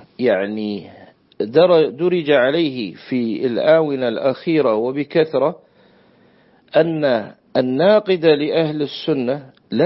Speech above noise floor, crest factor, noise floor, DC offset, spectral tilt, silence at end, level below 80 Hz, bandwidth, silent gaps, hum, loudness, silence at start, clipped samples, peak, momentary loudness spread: 36 dB; 16 dB; -53 dBFS; under 0.1%; -10.5 dB/octave; 0 s; -66 dBFS; 5.8 kHz; none; none; -18 LUFS; 0.2 s; under 0.1%; -2 dBFS; 9 LU